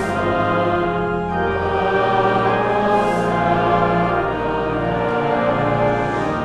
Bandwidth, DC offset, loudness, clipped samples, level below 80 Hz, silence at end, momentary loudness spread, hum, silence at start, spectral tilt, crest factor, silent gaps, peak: 11.5 kHz; under 0.1%; -18 LUFS; under 0.1%; -40 dBFS; 0 s; 4 LU; none; 0 s; -7 dB/octave; 14 dB; none; -4 dBFS